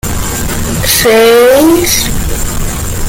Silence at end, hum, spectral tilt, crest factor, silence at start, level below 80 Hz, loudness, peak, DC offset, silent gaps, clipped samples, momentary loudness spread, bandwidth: 0 s; none; -3.5 dB/octave; 8 dB; 0.05 s; -20 dBFS; -9 LUFS; 0 dBFS; under 0.1%; none; under 0.1%; 11 LU; 17.5 kHz